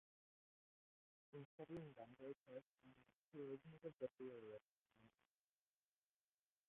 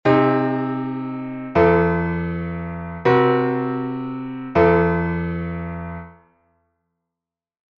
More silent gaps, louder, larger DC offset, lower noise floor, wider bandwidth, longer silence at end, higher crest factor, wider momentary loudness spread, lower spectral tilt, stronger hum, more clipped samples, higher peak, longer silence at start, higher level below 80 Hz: first, 1.45-1.58 s, 2.37-2.44 s, 2.66-2.75 s, 3.16-3.32 s, 4.62-4.85 s vs none; second, -58 LUFS vs -20 LUFS; neither; about the same, under -90 dBFS vs -88 dBFS; second, 3.8 kHz vs 5.8 kHz; about the same, 1.6 s vs 1.65 s; first, 24 dB vs 18 dB; second, 8 LU vs 14 LU; second, -6 dB/octave vs -9.5 dB/octave; first, 50 Hz at -90 dBFS vs none; neither; second, -38 dBFS vs -2 dBFS; first, 1.35 s vs 0.05 s; second, under -90 dBFS vs -42 dBFS